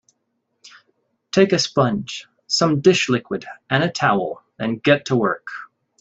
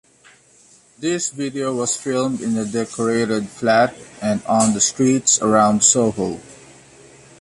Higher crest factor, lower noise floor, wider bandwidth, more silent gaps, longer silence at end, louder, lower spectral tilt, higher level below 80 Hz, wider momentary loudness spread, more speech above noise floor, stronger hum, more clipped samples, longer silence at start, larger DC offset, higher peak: about the same, 20 dB vs 18 dB; first, -72 dBFS vs -51 dBFS; second, 8.2 kHz vs 11.5 kHz; neither; second, 0.35 s vs 0.85 s; about the same, -19 LUFS vs -18 LUFS; first, -5 dB/octave vs -3.5 dB/octave; about the same, -60 dBFS vs -56 dBFS; first, 14 LU vs 10 LU; first, 54 dB vs 33 dB; neither; neither; second, 0.65 s vs 1 s; neither; about the same, -2 dBFS vs -2 dBFS